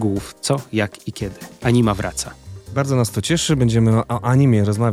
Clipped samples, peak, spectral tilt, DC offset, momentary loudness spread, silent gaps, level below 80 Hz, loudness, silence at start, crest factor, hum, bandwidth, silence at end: under 0.1%; -4 dBFS; -6 dB/octave; under 0.1%; 13 LU; none; -42 dBFS; -19 LUFS; 0 s; 14 dB; none; 15 kHz; 0 s